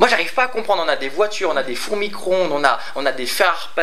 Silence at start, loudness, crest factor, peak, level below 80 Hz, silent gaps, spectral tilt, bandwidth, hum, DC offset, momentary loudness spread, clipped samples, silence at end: 0 s; -19 LUFS; 20 dB; 0 dBFS; -64 dBFS; none; -2.5 dB/octave; 16 kHz; none; 5%; 6 LU; under 0.1%; 0 s